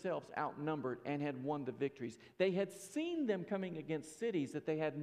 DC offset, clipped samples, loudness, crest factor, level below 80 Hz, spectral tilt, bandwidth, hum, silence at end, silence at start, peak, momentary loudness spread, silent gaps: under 0.1%; under 0.1%; -40 LUFS; 18 dB; -82 dBFS; -6 dB/octave; 15 kHz; none; 0 s; 0 s; -22 dBFS; 5 LU; none